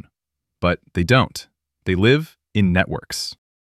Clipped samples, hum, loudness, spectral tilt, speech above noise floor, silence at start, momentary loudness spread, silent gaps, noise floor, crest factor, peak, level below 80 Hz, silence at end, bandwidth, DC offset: under 0.1%; none; -20 LUFS; -5.5 dB/octave; 64 dB; 0.6 s; 11 LU; none; -83 dBFS; 20 dB; -2 dBFS; -42 dBFS; 0.3 s; 14.5 kHz; under 0.1%